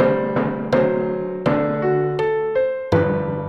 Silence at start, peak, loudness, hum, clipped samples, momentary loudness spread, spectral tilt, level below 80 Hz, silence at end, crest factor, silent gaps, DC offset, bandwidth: 0 s; -4 dBFS; -20 LUFS; none; under 0.1%; 4 LU; -8.5 dB/octave; -50 dBFS; 0 s; 16 dB; none; 0.3%; 7 kHz